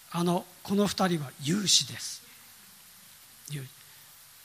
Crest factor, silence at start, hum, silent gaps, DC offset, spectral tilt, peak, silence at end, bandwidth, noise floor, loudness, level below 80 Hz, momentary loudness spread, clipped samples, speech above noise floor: 24 dB; 0.1 s; none; none; under 0.1%; -3.5 dB/octave; -8 dBFS; 0.2 s; 16 kHz; -53 dBFS; -28 LUFS; -68 dBFS; 27 LU; under 0.1%; 24 dB